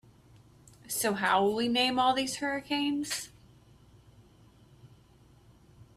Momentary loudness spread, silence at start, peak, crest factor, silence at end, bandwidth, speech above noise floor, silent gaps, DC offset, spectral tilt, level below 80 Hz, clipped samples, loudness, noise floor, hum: 10 LU; 0.85 s; -12 dBFS; 20 dB; 0.15 s; 15.5 kHz; 30 dB; none; under 0.1%; -2.5 dB/octave; -66 dBFS; under 0.1%; -29 LUFS; -59 dBFS; none